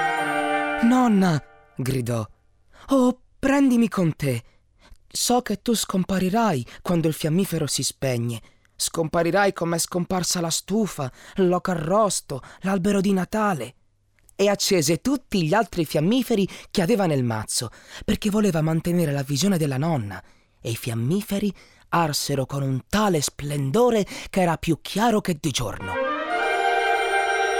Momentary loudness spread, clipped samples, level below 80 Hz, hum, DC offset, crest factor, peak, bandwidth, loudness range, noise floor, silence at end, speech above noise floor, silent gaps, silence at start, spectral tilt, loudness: 8 LU; under 0.1%; -48 dBFS; none; 0.1%; 14 dB; -10 dBFS; 19 kHz; 2 LU; -59 dBFS; 0 s; 37 dB; none; 0 s; -5 dB/octave; -23 LUFS